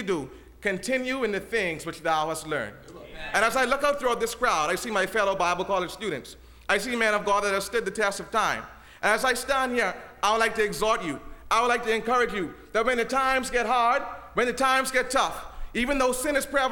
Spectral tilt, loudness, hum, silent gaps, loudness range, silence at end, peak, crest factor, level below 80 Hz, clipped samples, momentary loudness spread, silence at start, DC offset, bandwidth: -3 dB/octave; -25 LUFS; none; none; 2 LU; 0 s; -8 dBFS; 18 dB; -48 dBFS; under 0.1%; 9 LU; 0 s; under 0.1%; 20 kHz